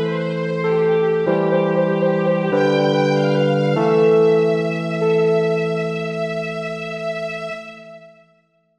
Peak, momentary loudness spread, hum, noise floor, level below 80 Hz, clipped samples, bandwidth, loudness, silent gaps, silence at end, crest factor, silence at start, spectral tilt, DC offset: -6 dBFS; 10 LU; none; -60 dBFS; -68 dBFS; under 0.1%; 9 kHz; -18 LUFS; none; 0.7 s; 14 dB; 0 s; -7.5 dB/octave; under 0.1%